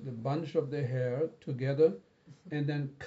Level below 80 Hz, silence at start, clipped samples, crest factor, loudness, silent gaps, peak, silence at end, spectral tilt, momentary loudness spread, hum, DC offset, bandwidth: -78 dBFS; 0 s; under 0.1%; 18 dB; -33 LUFS; none; -14 dBFS; 0 s; -7.5 dB/octave; 8 LU; none; under 0.1%; 7.6 kHz